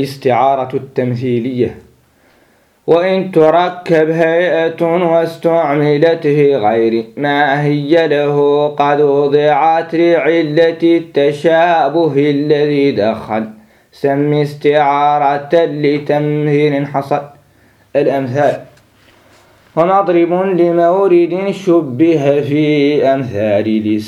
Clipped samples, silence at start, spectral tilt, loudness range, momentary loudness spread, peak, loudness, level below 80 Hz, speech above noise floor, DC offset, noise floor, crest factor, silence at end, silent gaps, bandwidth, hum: under 0.1%; 0 s; -7.5 dB/octave; 4 LU; 6 LU; 0 dBFS; -13 LUFS; -58 dBFS; 40 dB; under 0.1%; -52 dBFS; 12 dB; 0 s; none; 12 kHz; none